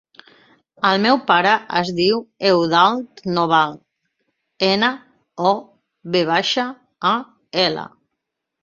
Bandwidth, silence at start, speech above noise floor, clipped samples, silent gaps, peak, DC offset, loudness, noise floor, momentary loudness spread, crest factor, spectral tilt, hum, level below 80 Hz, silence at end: 7.6 kHz; 0.8 s; 61 dB; under 0.1%; none; -2 dBFS; under 0.1%; -18 LUFS; -79 dBFS; 10 LU; 18 dB; -5 dB/octave; none; -62 dBFS; 0.75 s